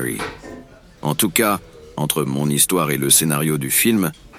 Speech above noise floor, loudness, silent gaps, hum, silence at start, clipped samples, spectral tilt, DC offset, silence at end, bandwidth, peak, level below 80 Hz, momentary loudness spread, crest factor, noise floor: 22 dB; -17 LUFS; none; none; 0 s; under 0.1%; -3.5 dB/octave; under 0.1%; 0 s; 19.5 kHz; -2 dBFS; -48 dBFS; 15 LU; 18 dB; -41 dBFS